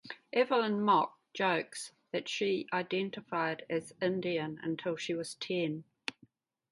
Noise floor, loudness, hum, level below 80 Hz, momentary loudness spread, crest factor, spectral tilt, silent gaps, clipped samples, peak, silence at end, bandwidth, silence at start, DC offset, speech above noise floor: -66 dBFS; -34 LUFS; none; -80 dBFS; 10 LU; 20 dB; -4.5 dB/octave; none; under 0.1%; -14 dBFS; 0.6 s; 11.5 kHz; 0.05 s; under 0.1%; 33 dB